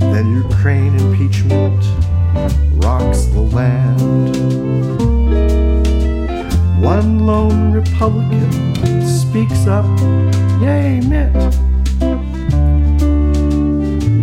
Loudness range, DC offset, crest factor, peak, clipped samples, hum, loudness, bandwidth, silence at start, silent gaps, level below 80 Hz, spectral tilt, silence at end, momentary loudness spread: 1 LU; under 0.1%; 12 dB; -2 dBFS; under 0.1%; none; -14 LUFS; 12.5 kHz; 0 s; none; -16 dBFS; -8 dB/octave; 0 s; 3 LU